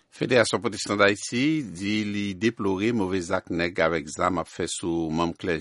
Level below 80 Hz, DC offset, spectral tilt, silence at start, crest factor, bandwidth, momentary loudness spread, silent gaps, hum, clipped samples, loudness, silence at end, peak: -54 dBFS; under 0.1%; -4.5 dB/octave; 0.15 s; 20 dB; 11.5 kHz; 7 LU; none; none; under 0.1%; -25 LUFS; 0 s; -4 dBFS